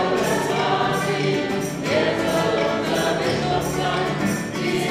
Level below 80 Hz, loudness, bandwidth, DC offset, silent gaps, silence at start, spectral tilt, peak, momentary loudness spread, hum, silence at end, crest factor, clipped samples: -48 dBFS; -21 LUFS; 16 kHz; under 0.1%; none; 0 s; -4.5 dB/octave; -8 dBFS; 3 LU; none; 0 s; 14 dB; under 0.1%